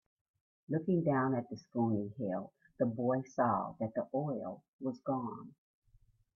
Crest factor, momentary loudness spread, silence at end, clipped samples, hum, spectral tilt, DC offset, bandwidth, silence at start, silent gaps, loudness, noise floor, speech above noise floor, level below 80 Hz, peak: 18 dB; 10 LU; 0.85 s; under 0.1%; none; -9.5 dB/octave; under 0.1%; 6.8 kHz; 0.7 s; 4.68-4.79 s; -36 LUFS; -68 dBFS; 33 dB; -76 dBFS; -18 dBFS